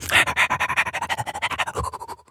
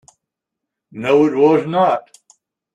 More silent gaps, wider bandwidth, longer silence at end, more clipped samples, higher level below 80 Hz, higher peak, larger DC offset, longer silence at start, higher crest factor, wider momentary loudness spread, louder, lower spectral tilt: neither; first, over 20 kHz vs 9.8 kHz; second, 0.15 s vs 0.75 s; neither; first, -46 dBFS vs -64 dBFS; about the same, 0 dBFS vs -2 dBFS; neither; second, 0 s vs 0.95 s; first, 22 dB vs 16 dB; about the same, 12 LU vs 10 LU; second, -22 LUFS vs -15 LUFS; second, -2 dB/octave vs -7 dB/octave